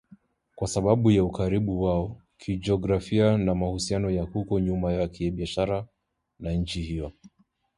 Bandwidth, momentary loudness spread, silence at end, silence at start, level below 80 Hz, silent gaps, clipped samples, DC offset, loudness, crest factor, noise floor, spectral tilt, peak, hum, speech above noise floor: 11.5 kHz; 12 LU; 0.5 s; 0.55 s; -42 dBFS; none; under 0.1%; under 0.1%; -26 LUFS; 20 dB; -57 dBFS; -7 dB/octave; -6 dBFS; none; 31 dB